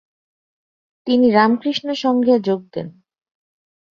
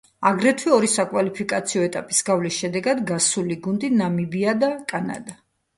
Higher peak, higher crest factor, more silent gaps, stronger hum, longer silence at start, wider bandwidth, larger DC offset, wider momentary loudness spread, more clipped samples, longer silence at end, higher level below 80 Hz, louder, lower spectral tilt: about the same, -2 dBFS vs -2 dBFS; about the same, 18 dB vs 20 dB; neither; neither; first, 1.05 s vs 0.2 s; second, 7 kHz vs 11.5 kHz; neither; first, 17 LU vs 8 LU; neither; first, 1.05 s vs 0.45 s; about the same, -64 dBFS vs -64 dBFS; first, -17 LUFS vs -21 LUFS; first, -6.5 dB/octave vs -4 dB/octave